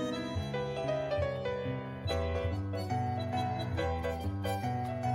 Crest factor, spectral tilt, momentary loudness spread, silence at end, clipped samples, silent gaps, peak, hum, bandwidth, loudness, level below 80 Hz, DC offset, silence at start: 14 dB; -7 dB/octave; 3 LU; 0 s; under 0.1%; none; -20 dBFS; none; 16 kHz; -35 LUFS; -52 dBFS; under 0.1%; 0 s